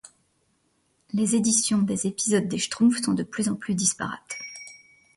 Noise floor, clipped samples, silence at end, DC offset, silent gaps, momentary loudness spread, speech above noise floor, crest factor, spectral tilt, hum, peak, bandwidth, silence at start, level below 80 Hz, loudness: -69 dBFS; under 0.1%; 0.4 s; under 0.1%; none; 14 LU; 45 dB; 18 dB; -3.5 dB/octave; none; -8 dBFS; 11.5 kHz; 1.15 s; -64 dBFS; -24 LUFS